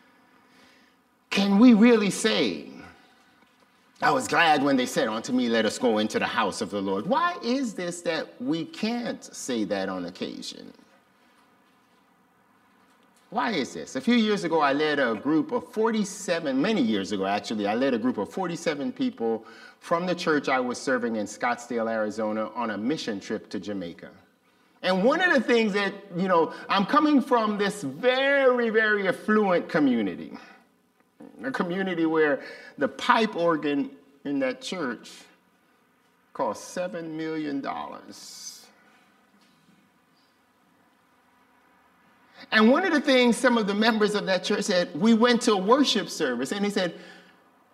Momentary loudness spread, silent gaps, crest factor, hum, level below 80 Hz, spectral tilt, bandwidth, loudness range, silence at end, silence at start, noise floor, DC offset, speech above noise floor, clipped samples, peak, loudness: 13 LU; none; 20 dB; none; -74 dBFS; -4.5 dB/octave; 14.5 kHz; 11 LU; 0.55 s; 1.3 s; -65 dBFS; under 0.1%; 40 dB; under 0.1%; -6 dBFS; -25 LUFS